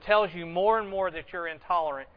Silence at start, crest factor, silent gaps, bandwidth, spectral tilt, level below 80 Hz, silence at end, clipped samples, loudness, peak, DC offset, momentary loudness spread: 0 s; 18 dB; none; 5.2 kHz; -7.5 dB/octave; -56 dBFS; 0.1 s; under 0.1%; -28 LUFS; -8 dBFS; under 0.1%; 10 LU